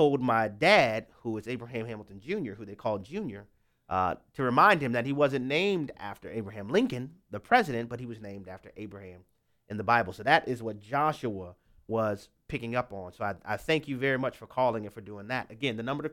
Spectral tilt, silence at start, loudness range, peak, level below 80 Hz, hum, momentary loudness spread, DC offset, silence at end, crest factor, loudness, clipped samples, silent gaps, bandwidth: -6 dB/octave; 0 s; 6 LU; -8 dBFS; -62 dBFS; none; 18 LU; under 0.1%; 0 s; 22 dB; -29 LUFS; under 0.1%; none; 16.5 kHz